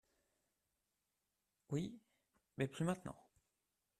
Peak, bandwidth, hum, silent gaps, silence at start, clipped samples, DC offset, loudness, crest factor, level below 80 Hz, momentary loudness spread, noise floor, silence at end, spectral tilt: -26 dBFS; 13.5 kHz; none; none; 1.7 s; under 0.1%; under 0.1%; -44 LUFS; 22 dB; -78 dBFS; 20 LU; -89 dBFS; 0.85 s; -6.5 dB/octave